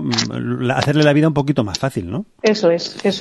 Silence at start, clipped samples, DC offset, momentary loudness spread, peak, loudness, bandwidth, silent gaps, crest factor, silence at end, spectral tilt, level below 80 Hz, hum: 0 s; under 0.1%; under 0.1%; 8 LU; 0 dBFS; -17 LUFS; 12.5 kHz; none; 16 dB; 0 s; -5.5 dB/octave; -46 dBFS; none